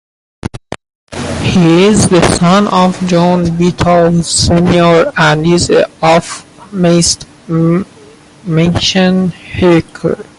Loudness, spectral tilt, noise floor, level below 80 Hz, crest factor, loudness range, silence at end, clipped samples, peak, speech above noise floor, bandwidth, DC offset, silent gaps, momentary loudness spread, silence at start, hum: -10 LUFS; -5 dB/octave; -38 dBFS; -32 dBFS; 10 dB; 3 LU; 0.15 s; under 0.1%; 0 dBFS; 29 dB; 11.5 kHz; under 0.1%; 0.95-1.07 s; 17 LU; 0.55 s; none